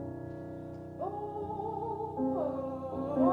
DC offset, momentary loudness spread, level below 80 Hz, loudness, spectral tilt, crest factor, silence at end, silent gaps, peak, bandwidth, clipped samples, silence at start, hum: under 0.1%; 10 LU; -64 dBFS; -36 LUFS; -10 dB/octave; 20 dB; 0 s; none; -14 dBFS; 4.6 kHz; under 0.1%; 0 s; none